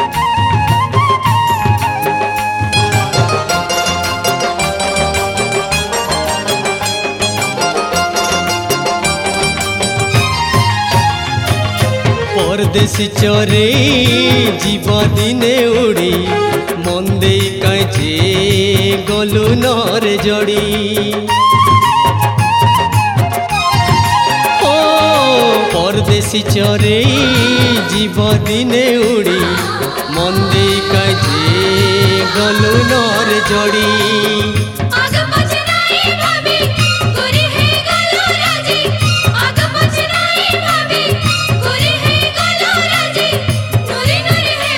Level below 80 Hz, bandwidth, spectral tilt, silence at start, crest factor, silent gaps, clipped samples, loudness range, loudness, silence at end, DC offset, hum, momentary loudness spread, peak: -34 dBFS; 17.5 kHz; -4.5 dB/octave; 0 s; 12 dB; none; under 0.1%; 3 LU; -12 LUFS; 0 s; under 0.1%; none; 5 LU; 0 dBFS